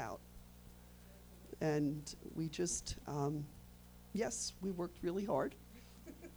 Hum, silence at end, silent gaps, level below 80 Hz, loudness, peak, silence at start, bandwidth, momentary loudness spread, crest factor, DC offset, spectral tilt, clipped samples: 60 Hz at -60 dBFS; 0 s; none; -60 dBFS; -41 LUFS; -24 dBFS; 0 s; over 20 kHz; 21 LU; 18 dB; under 0.1%; -5 dB/octave; under 0.1%